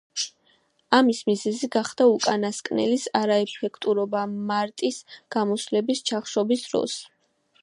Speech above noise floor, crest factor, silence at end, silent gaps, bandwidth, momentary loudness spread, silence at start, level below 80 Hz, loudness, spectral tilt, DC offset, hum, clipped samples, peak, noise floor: 41 dB; 22 dB; 0.55 s; none; 11.5 kHz; 10 LU; 0.15 s; -74 dBFS; -24 LUFS; -4 dB/octave; under 0.1%; none; under 0.1%; -2 dBFS; -64 dBFS